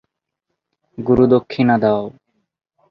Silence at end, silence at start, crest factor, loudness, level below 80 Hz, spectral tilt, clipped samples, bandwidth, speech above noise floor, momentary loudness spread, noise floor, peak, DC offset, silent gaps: 0.8 s; 1 s; 18 dB; -16 LUFS; -48 dBFS; -9.5 dB/octave; under 0.1%; 5.8 kHz; 63 dB; 13 LU; -77 dBFS; -2 dBFS; under 0.1%; none